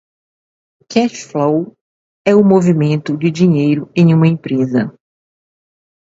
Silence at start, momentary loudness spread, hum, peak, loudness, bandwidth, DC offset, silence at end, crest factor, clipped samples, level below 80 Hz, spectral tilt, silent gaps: 0.9 s; 8 LU; none; 0 dBFS; -14 LUFS; 7.8 kHz; under 0.1%; 1.25 s; 14 dB; under 0.1%; -58 dBFS; -7.5 dB/octave; 1.81-2.25 s